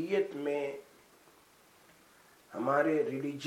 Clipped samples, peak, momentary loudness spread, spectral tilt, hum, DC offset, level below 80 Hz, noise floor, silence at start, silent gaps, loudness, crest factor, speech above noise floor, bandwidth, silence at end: under 0.1%; -16 dBFS; 14 LU; -6 dB/octave; none; under 0.1%; -82 dBFS; -62 dBFS; 0 s; none; -32 LUFS; 20 dB; 30 dB; 16.5 kHz; 0 s